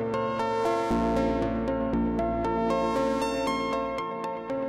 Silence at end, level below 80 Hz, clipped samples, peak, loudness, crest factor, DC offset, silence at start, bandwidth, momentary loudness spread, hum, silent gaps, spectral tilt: 0 s; -42 dBFS; under 0.1%; -14 dBFS; -28 LUFS; 12 dB; under 0.1%; 0 s; 14.5 kHz; 5 LU; none; none; -6 dB/octave